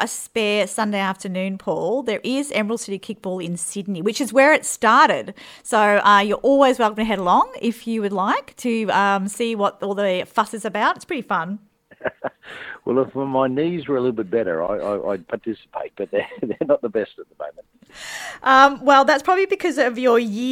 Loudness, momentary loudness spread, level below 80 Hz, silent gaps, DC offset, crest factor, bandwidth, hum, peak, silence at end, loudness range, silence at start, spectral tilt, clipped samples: -19 LUFS; 16 LU; -58 dBFS; none; under 0.1%; 20 dB; 16.5 kHz; none; 0 dBFS; 0 s; 8 LU; 0 s; -4 dB/octave; under 0.1%